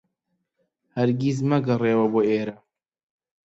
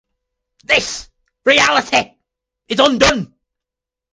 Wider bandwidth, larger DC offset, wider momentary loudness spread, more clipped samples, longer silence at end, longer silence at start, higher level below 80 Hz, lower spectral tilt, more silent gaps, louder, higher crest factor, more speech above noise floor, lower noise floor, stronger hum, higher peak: second, 8 kHz vs 10 kHz; neither; second, 8 LU vs 16 LU; neither; about the same, 0.9 s vs 0.9 s; first, 0.95 s vs 0.7 s; second, -64 dBFS vs -42 dBFS; first, -8 dB/octave vs -2.5 dB/octave; neither; second, -22 LUFS vs -14 LUFS; about the same, 16 dB vs 18 dB; second, 55 dB vs 71 dB; second, -77 dBFS vs -85 dBFS; neither; second, -8 dBFS vs 0 dBFS